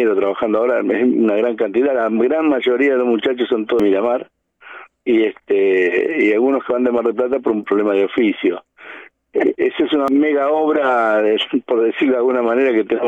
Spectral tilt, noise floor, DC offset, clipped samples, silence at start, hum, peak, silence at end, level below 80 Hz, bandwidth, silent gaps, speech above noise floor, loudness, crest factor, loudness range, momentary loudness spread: -6.5 dB/octave; -40 dBFS; under 0.1%; under 0.1%; 0 s; none; -4 dBFS; 0 s; -60 dBFS; 7.4 kHz; none; 24 dB; -16 LUFS; 12 dB; 2 LU; 4 LU